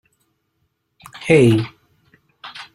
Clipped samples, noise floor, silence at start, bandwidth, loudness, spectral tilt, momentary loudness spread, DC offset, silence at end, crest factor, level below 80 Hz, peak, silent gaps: under 0.1%; -70 dBFS; 1.2 s; 13 kHz; -15 LUFS; -7 dB/octave; 24 LU; under 0.1%; 0.1 s; 20 dB; -54 dBFS; -2 dBFS; none